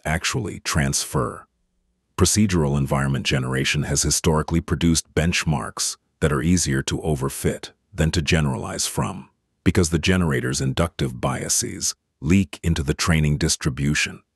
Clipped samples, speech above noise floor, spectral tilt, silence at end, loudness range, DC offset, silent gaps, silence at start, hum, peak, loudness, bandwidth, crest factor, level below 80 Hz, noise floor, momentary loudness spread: under 0.1%; 48 dB; -4.5 dB/octave; 0.2 s; 2 LU; under 0.1%; none; 0.05 s; none; -4 dBFS; -22 LUFS; 12.5 kHz; 18 dB; -36 dBFS; -70 dBFS; 6 LU